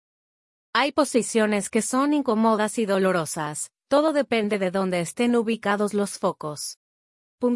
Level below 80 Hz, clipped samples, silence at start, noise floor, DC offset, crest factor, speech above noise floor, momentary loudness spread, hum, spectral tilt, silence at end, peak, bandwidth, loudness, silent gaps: -68 dBFS; under 0.1%; 0.75 s; under -90 dBFS; under 0.1%; 18 dB; over 67 dB; 7 LU; none; -4.5 dB/octave; 0 s; -6 dBFS; 12 kHz; -23 LUFS; 6.76-7.38 s